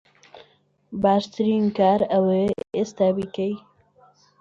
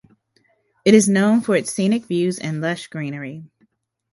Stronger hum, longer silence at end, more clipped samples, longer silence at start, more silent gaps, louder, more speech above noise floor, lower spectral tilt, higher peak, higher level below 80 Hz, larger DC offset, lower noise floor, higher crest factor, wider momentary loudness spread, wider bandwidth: neither; about the same, 0.8 s vs 0.7 s; neither; second, 0.35 s vs 0.85 s; neither; second, -22 LUFS vs -19 LUFS; second, 39 dB vs 45 dB; first, -7.5 dB/octave vs -5 dB/octave; second, -6 dBFS vs 0 dBFS; about the same, -60 dBFS vs -64 dBFS; neither; about the same, -61 dBFS vs -64 dBFS; about the same, 18 dB vs 20 dB; second, 9 LU vs 15 LU; second, 7.6 kHz vs 11.5 kHz